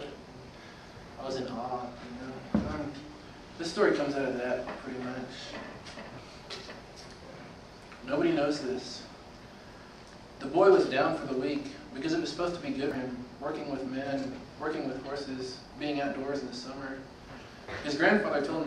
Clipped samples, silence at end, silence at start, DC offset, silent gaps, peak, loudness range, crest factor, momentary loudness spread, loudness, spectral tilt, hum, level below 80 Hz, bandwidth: under 0.1%; 0 s; 0 s; under 0.1%; none; -10 dBFS; 9 LU; 22 dB; 21 LU; -32 LUFS; -5.5 dB/octave; none; -58 dBFS; 11 kHz